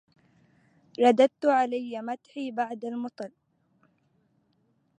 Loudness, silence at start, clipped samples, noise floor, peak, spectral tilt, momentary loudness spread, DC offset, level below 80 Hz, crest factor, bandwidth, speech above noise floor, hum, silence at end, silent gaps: -27 LUFS; 1 s; under 0.1%; -70 dBFS; -8 dBFS; -5 dB/octave; 18 LU; under 0.1%; -84 dBFS; 20 dB; 9.8 kHz; 44 dB; none; 1.7 s; none